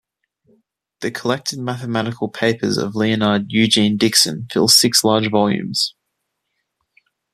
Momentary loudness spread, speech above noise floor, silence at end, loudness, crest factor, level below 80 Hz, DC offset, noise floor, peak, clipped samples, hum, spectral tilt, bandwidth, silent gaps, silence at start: 12 LU; 58 dB; 1.45 s; -16 LUFS; 18 dB; -58 dBFS; under 0.1%; -75 dBFS; 0 dBFS; under 0.1%; none; -3.5 dB/octave; 14.5 kHz; none; 1 s